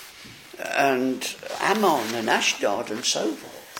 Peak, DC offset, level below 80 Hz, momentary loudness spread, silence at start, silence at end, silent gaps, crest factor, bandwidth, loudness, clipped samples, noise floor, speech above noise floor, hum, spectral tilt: -6 dBFS; under 0.1%; -68 dBFS; 15 LU; 0 s; 0 s; none; 20 dB; 17 kHz; -23 LUFS; under 0.1%; -44 dBFS; 20 dB; none; -2.5 dB/octave